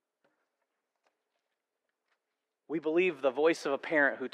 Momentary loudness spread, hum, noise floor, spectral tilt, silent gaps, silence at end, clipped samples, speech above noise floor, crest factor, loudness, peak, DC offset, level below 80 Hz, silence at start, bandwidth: 7 LU; none; -87 dBFS; -5 dB/octave; none; 0.05 s; under 0.1%; 57 dB; 20 dB; -30 LUFS; -14 dBFS; under 0.1%; under -90 dBFS; 2.7 s; 11.5 kHz